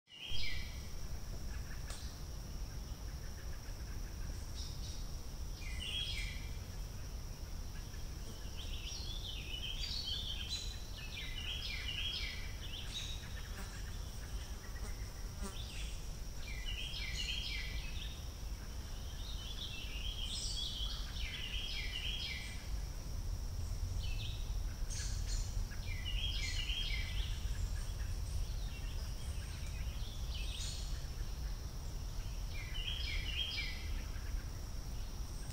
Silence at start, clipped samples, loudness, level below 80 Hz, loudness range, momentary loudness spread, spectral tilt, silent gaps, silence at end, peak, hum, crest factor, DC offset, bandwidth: 0.1 s; under 0.1%; -43 LUFS; -44 dBFS; 6 LU; 9 LU; -3 dB/octave; none; 0 s; -24 dBFS; none; 16 dB; under 0.1%; 16 kHz